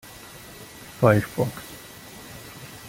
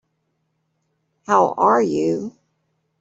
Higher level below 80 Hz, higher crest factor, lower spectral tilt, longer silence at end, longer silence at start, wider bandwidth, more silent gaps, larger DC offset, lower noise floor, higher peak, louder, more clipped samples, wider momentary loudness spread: first, -54 dBFS vs -66 dBFS; about the same, 24 dB vs 20 dB; about the same, -6.5 dB/octave vs -6 dB/octave; second, 0 s vs 0.7 s; second, 0.25 s vs 1.3 s; first, 17 kHz vs 8 kHz; neither; neither; second, -43 dBFS vs -71 dBFS; about the same, -2 dBFS vs -2 dBFS; second, -22 LUFS vs -18 LUFS; neither; first, 22 LU vs 10 LU